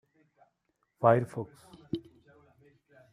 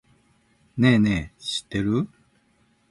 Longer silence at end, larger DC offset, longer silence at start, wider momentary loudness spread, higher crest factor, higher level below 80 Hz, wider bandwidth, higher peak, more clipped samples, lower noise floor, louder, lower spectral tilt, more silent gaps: first, 1.1 s vs 0.85 s; neither; first, 1 s vs 0.75 s; first, 16 LU vs 13 LU; first, 26 dB vs 18 dB; second, -72 dBFS vs -48 dBFS; about the same, 11.5 kHz vs 11.5 kHz; about the same, -8 dBFS vs -6 dBFS; neither; first, -78 dBFS vs -64 dBFS; second, -30 LUFS vs -23 LUFS; first, -8.5 dB/octave vs -6 dB/octave; neither